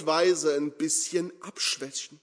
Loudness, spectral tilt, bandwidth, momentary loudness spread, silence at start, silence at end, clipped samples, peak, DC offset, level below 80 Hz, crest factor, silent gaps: -27 LUFS; -2 dB/octave; 11 kHz; 9 LU; 0 s; 0.05 s; under 0.1%; -10 dBFS; under 0.1%; -84 dBFS; 18 dB; none